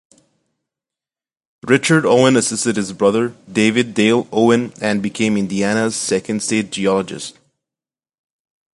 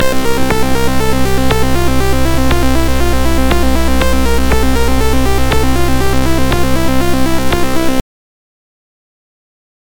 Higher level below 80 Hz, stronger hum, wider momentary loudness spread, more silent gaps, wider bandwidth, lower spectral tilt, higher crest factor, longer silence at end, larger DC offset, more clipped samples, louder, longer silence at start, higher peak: second, -58 dBFS vs -18 dBFS; neither; first, 7 LU vs 2 LU; neither; second, 11.5 kHz vs 19 kHz; about the same, -4.5 dB/octave vs -5 dB/octave; first, 18 dB vs 10 dB; second, 1.45 s vs 2 s; neither; neither; about the same, -16 LUFS vs -14 LUFS; first, 1.65 s vs 0 s; about the same, 0 dBFS vs 0 dBFS